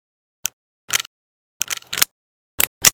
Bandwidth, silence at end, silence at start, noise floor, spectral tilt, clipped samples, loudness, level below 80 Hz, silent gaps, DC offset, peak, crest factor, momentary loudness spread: over 20 kHz; 0 s; 0.45 s; under -90 dBFS; 1 dB/octave; 0.1%; -21 LUFS; -50 dBFS; 0.53-0.88 s, 1.07-1.60 s, 2.11-2.58 s, 2.67-2.81 s; under 0.1%; 0 dBFS; 24 dB; 9 LU